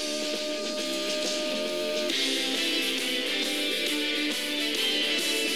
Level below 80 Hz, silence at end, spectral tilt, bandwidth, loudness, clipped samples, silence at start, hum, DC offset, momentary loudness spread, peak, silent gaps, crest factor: under -90 dBFS; 0 s; -0.5 dB/octave; over 20 kHz; -26 LUFS; under 0.1%; 0 s; none; 0.4%; 5 LU; -14 dBFS; none; 14 dB